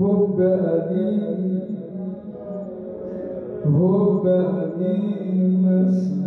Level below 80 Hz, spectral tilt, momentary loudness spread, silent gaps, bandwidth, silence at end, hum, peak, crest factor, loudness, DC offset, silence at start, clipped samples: -62 dBFS; -11.5 dB/octave; 14 LU; none; 4 kHz; 0 s; none; -10 dBFS; 10 dB; -21 LUFS; under 0.1%; 0 s; under 0.1%